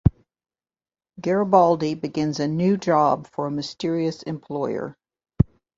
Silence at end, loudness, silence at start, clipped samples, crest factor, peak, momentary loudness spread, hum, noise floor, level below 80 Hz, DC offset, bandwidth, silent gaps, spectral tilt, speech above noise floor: 0.35 s; -23 LUFS; 0.05 s; under 0.1%; 22 dB; -2 dBFS; 12 LU; none; under -90 dBFS; -40 dBFS; under 0.1%; 7.8 kHz; none; -7.5 dB/octave; over 68 dB